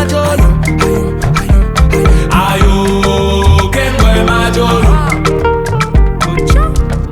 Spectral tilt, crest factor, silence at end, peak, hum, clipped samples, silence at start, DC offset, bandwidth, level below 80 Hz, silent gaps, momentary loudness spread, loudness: -6 dB/octave; 8 dB; 0 s; 0 dBFS; none; under 0.1%; 0 s; under 0.1%; 15.5 kHz; -12 dBFS; none; 4 LU; -11 LUFS